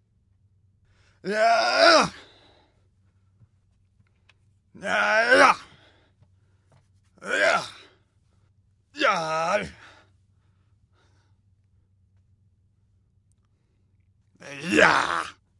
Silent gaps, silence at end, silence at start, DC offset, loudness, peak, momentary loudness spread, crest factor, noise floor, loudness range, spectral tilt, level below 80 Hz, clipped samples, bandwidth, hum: none; 0.3 s; 1.25 s; under 0.1%; -21 LUFS; -2 dBFS; 21 LU; 24 dB; -66 dBFS; 7 LU; -3 dB/octave; -66 dBFS; under 0.1%; 11.5 kHz; none